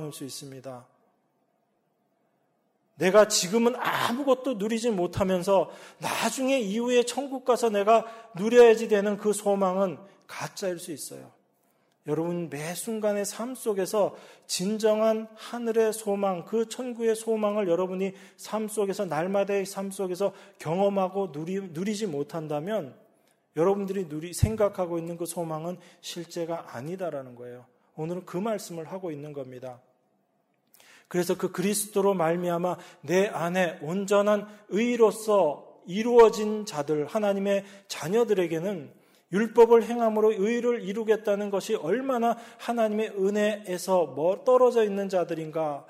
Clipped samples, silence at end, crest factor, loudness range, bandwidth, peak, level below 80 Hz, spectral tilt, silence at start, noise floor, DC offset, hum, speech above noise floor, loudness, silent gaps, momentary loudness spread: under 0.1%; 0.05 s; 20 dB; 11 LU; 16 kHz; -8 dBFS; -56 dBFS; -5 dB/octave; 0 s; -72 dBFS; under 0.1%; none; 46 dB; -26 LUFS; none; 15 LU